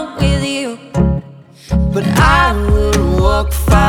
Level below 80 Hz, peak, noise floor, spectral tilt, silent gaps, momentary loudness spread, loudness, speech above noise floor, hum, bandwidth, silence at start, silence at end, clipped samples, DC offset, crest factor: -18 dBFS; 0 dBFS; -37 dBFS; -6 dB/octave; none; 9 LU; -14 LUFS; 25 dB; none; 17 kHz; 0 s; 0 s; under 0.1%; under 0.1%; 12 dB